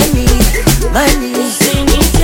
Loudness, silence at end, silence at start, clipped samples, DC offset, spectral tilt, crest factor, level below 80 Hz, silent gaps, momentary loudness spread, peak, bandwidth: -11 LUFS; 0 s; 0 s; under 0.1%; under 0.1%; -4 dB/octave; 10 dB; -14 dBFS; none; 2 LU; 0 dBFS; 17.5 kHz